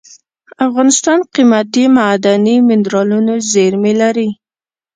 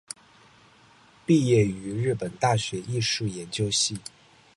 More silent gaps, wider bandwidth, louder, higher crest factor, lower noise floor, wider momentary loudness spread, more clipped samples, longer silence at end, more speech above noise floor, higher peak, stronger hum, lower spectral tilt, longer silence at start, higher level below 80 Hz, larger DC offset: neither; second, 9.6 kHz vs 11.5 kHz; first, -11 LUFS vs -25 LUFS; second, 12 dB vs 18 dB; first, under -90 dBFS vs -56 dBFS; second, 6 LU vs 17 LU; neither; about the same, 0.6 s vs 0.55 s; first, over 79 dB vs 31 dB; first, 0 dBFS vs -8 dBFS; neither; about the same, -4.5 dB/octave vs -4.5 dB/octave; second, 0.6 s vs 1.3 s; about the same, -60 dBFS vs -56 dBFS; neither